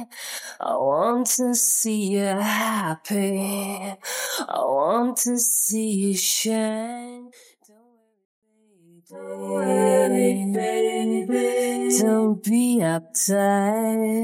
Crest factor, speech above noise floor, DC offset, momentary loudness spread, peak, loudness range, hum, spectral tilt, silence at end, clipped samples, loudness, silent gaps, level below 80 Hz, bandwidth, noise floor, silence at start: 16 dB; 38 dB; under 0.1%; 11 LU; -6 dBFS; 6 LU; none; -3.5 dB/octave; 0 s; under 0.1%; -22 LUFS; 8.25-8.42 s; -84 dBFS; 16.5 kHz; -60 dBFS; 0 s